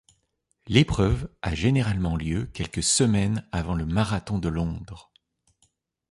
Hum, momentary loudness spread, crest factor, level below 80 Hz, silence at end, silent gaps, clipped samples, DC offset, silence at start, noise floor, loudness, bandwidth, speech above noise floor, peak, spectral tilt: none; 10 LU; 22 dB; -38 dBFS; 1.1 s; none; under 0.1%; under 0.1%; 0.65 s; -73 dBFS; -25 LUFS; 11.5 kHz; 49 dB; -4 dBFS; -5 dB/octave